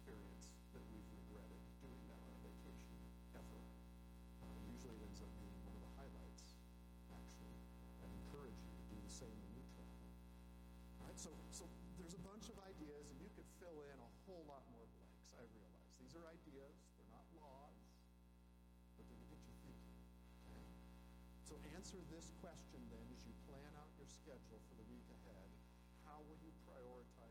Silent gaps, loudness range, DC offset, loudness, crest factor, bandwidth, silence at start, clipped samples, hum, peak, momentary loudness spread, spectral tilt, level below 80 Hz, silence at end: none; 6 LU; under 0.1%; -60 LUFS; 16 dB; 18 kHz; 0 s; under 0.1%; 60 Hz at -60 dBFS; -42 dBFS; 8 LU; -5.5 dB/octave; -64 dBFS; 0 s